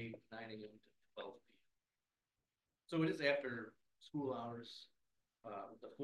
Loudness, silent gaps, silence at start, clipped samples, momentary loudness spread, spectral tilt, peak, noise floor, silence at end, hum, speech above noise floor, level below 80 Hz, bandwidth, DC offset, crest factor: -44 LUFS; none; 0 s; under 0.1%; 19 LU; -6.5 dB/octave; -22 dBFS; under -90 dBFS; 0 s; none; over 46 dB; -88 dBFS; 12 kHz; under 0.1%; 24 dB